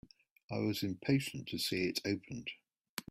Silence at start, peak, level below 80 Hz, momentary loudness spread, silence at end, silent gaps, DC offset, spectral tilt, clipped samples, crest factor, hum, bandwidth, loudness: 0.5 s; -18 dBFS; -70 dBFS; 13 LU; 0.1 s; 2.89-2.97 s; under 0.1%; -5 dB/octave; under 0.1%; 20 dB; none; 16 kHz; -37 LUFS